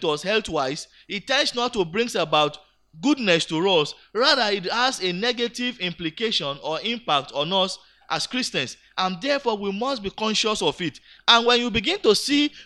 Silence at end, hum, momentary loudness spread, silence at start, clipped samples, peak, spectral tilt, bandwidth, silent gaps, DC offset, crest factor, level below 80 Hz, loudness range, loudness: 0 s; none; 9 LU; 0 s; under 0.1%; 0 dBFS; -3 dB/octave; 13 kHz; none; under 0.1%; 22 dB; -56 dBFS; 3 LU; -22 LUFS